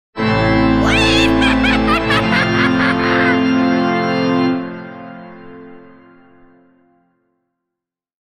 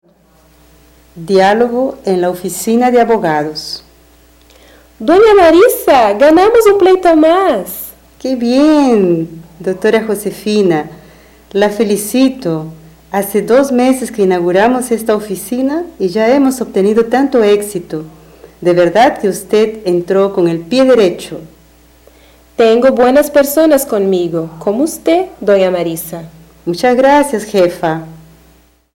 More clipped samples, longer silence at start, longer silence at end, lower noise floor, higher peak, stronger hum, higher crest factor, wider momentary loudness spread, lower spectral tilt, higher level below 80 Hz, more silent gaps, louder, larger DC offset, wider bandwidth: neither; second, 0.15 s vs 1.15 s; first, 2.5 s vs 0.75 s; first, -83 dBFS vs -48 dBFS; about the same, 0 dBFS vs 0 dBFS; neither; first, 16 dB vs 10 dB; first, 18 LU vs 13 LU; about the same, -5.5 dB/octave vs -5 dB/octave; first, -32 dBFS vs -44 dBFS; neither; second, -14 LUFS vs -11 LUFS; neither; second, 11 kHz vs 17 kHz